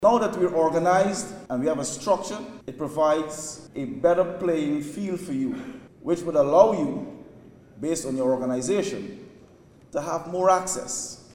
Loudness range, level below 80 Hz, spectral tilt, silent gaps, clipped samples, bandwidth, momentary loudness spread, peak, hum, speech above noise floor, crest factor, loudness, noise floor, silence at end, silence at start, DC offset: 3 LU; -58 dBFS; -5 dB/octave; none; under 0.1%; 16 kHz; 14 LU; -2 dBFS; none; 28 dB; 22 dB; -25 LUFS; -52 dBFS; 0.15 s; 0 s; under 0.1%